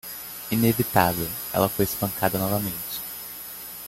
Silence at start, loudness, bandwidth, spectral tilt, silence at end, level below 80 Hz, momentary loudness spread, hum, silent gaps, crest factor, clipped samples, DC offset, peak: 0.05 s; -25 LUFS; 17 kHz; -5 dB/octave; 0 s; -52 dBFS; 13 LU; none; none; 22 dB; under 0.1%; under 0.1%; -4 dBFS